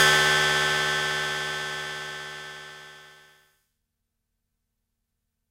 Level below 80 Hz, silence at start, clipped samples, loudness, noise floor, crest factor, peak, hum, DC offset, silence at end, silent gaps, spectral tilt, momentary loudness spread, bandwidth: -60 dBFS; 0 s; under 0.1%; -23 LUFS; -80 dBFS; 22 dB; -6 dBFS; 50 Hz at -80 dBFS; under 0.1%; 2.4 s; none; -1.5 dB/octave; 22 LU; 16 kHz